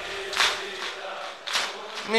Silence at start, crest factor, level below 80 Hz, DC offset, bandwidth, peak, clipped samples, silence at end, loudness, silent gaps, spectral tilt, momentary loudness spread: 0 s; 24 dB; -64 dBFS; 0.1%; 13 kHz; -6 dBFS; under 0.1%; 0 s; -27 LUFS; none; -0.5 dB/octave; 11 LU